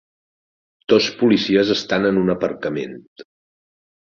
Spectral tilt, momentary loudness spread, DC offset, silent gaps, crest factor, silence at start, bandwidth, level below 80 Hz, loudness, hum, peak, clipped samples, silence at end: -5.5 dB/octave; 15 LU; under 0.1%; 3.07-3.16 s; 18 dB; 0.9 s; 7.2 kHz; -56 dBFS; -18 LUFS; none; -2 dBFS; under 0.1%; 0.85 s